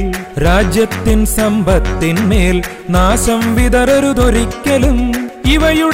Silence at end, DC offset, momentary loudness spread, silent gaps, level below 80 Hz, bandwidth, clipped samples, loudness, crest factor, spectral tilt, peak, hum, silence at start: 0 s; 0.4%; 5 LU; none; -18 dBFS; 16 kHz; under 0.1%; -13 LUFS; 10 dB; -5 dB/octave; -2 dBFS; none; 0 s